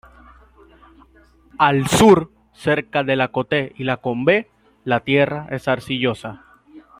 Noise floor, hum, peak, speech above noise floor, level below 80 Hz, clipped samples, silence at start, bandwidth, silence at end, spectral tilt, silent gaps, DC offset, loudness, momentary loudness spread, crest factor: -52 dBFS; none; -2 dBFS; 34 dB; -50 dBFS; under 0.1%; 1.6 s; 16 kHz; 0.2 s; -5 dB/octave; none; under 0.1%; -18 LUFS; 12 LU; 18 dB